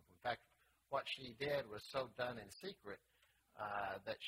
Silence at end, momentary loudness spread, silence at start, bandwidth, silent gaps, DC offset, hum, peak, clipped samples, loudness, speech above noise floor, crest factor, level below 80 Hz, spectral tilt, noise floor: 0 s; 10 LU; 0.1 s; 16 kHz; none; under 0.1%; none; -26 dBFS; under 0.1%; -46 LUFS; 31 dB; 20 dB; -76 dBFS; -4.5 dB/octave; -76 dBFS